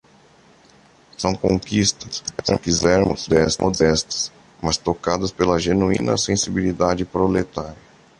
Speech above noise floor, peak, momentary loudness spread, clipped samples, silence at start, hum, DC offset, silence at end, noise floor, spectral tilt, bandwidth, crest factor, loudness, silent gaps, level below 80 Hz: 32 dB; -2 dBFS; 9 LU; under 0.1%; 1.2 s; none; under 0.1%; 0.45 s; -52 dBFS; -4.5 dB/octave; 11.5 kHz; 18 dB; -20 LUFS; none; -40 dBFS